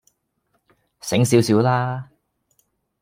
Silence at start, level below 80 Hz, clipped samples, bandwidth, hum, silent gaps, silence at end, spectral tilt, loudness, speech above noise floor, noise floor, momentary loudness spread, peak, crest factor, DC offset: 1.05 s; -62 dBFS; under 0.1%; 16.5 kHz; none; none; 1 s; -6 dB/octave; -19 LUFS; 52 dB; -70 dBFS; 15 LU; -2 dBFS; 20 dB; under 0.1%